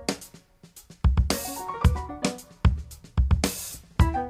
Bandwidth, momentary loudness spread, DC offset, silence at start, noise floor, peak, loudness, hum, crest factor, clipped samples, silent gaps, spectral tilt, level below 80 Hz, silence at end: 16 kHz; 9 LU; under 0.1%; 0 s; -52 dBFS; -6 dBFS; -27 LUFS; none; 20 dB; under 0.1%; none; -5 dB/octave; -28 dBFS; 0 s